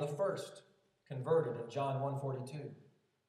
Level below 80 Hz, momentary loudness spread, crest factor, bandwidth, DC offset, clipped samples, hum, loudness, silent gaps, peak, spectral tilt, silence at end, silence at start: under -90 dBFS; 16 LU; 18 dB; 13 kHz; under 0.1%; under 0.1%; none; -38 LUFS; none; -22 dBFS; -7 dB/octave; 0.45 s; 0 s